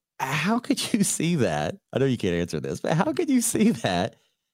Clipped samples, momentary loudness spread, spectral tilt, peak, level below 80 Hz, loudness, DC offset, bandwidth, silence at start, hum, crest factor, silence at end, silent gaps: under 0.1%; 7 LU; -4.5 dB/octave; -6 dBFS; -56 dBFS; -24 LUFS; under 0.1%; 16 kHz; 0.2 s; none; 18 dB; 0.45 s; none